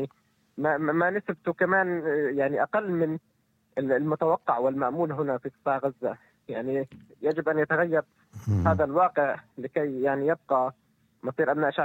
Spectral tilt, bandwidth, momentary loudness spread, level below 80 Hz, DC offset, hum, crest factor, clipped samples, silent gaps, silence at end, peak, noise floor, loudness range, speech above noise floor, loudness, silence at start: -9 dB/octave; 17 kHz; 11 LU; -58 dBFS; under 0.1%; none; 18 dB; under 0.1%; none; 0 s; -10 dBFS; -63 dBFS; 3 LU; 37 dB; -27 LUFS; 0 s